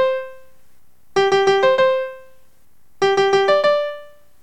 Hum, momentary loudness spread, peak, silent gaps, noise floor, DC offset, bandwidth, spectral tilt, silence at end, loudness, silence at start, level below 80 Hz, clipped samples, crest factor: none; 14 LU; -4 dBFS; none; -57 dBFS; 0.9%; 9.4 kHz; -3.5 dB/octave; 0.4 s; -17 LUFS; 0 s; -60 dBFS; under 0.1%; 16 dB